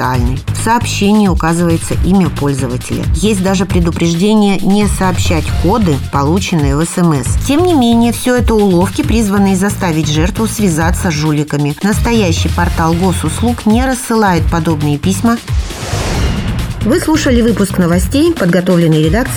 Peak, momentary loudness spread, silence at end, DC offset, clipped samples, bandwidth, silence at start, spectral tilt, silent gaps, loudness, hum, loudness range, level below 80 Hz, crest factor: 0 dBFS; 5 LU; 0 s; under 0.1%; under 0.1%; 18 kHz; 0 s; -5.5 dB/octave; none; -12 LUFS; none; 2 LU; -22 dBFS; 12 dB